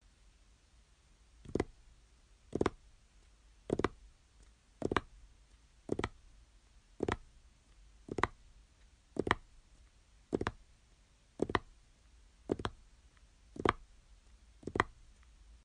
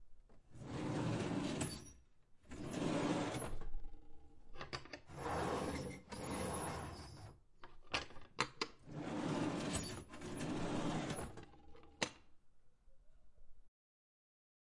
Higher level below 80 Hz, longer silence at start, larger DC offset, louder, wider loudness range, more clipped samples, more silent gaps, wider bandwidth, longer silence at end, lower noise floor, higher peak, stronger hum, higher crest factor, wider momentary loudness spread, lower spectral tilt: about the same, -56 dBFS vs -56 dBFS; first, 1.45 s vs 0 s; neither; first, -39 LUFS vs -43 LUFS; about the same, 3 LU vs 4 LU; neither; neither; second, 10 kHz vs 11.5 kHz; second, 0.1 s vs 1 s; about the same, -66 dBFS vs -64 dBFS; first, -12 dBFS vs -20 dBFS; neither; first, 32 dB vs 26 dB; about the same, 17 LU vs 17 LU; about the same, -5.5 dB/octave vs -4.5 dB/octave